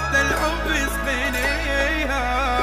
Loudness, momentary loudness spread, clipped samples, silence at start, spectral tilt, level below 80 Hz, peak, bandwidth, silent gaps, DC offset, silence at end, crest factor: -21 LUFS; 3 LU; under 0.1%; 0 s; -3.5 dB/octave; -28 dBFS; -8 dBFS; 16 kHz; none; under 0.1%; 0 s; 14 dB